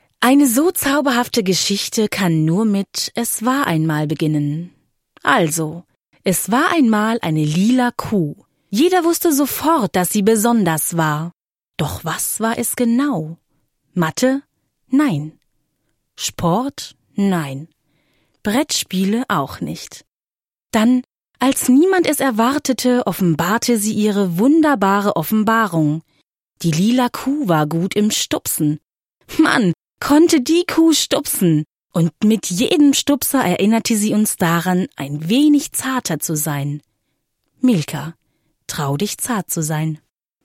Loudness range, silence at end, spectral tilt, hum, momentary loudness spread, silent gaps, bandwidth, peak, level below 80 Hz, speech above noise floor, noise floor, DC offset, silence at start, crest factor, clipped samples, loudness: 6 LU; 0.5 s; -4.5 dB/octave; none; 11 LU; none; 16.5 kHz; 0 dBFS; -54 dBFS; over 74 dB; under -90 dBFS; under 0.1%; 0.2 s; 18 dB; under 0.1%; -17 LUFS